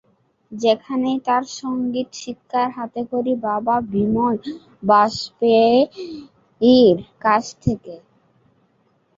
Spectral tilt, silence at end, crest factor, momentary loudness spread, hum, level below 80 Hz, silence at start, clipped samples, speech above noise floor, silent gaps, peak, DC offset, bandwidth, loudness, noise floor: -6 dB/octave; 1.2 s; 16 dB; 16 LU; none; -50 dBFS; 0.5 s; under 0.1%; 44 dB; none; -2 dBFS; under 0.1%; 7.6 kHz; -19 LUFS; -62 dBFS